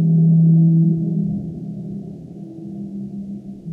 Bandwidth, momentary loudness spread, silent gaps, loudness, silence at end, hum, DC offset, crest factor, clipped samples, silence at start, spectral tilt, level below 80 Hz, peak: 0.8 kHz; 21 LU; none; -16 LUFS; 0 s; none; under 0.1%; 12 dB; under 0.1%; 0 s; -13.5 dB/octave; -52 dBFS; -6 dBFS